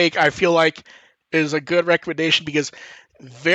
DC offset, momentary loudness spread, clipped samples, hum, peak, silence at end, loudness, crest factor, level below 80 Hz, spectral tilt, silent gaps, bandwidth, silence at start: under 0.1%; 7 LU; under 0.1%; none; -2 dBFS; 0 s; -19 LUFS; 18 dB; -62 dBFS; -4 dB/octave; none; 8.6 kHz; 0 s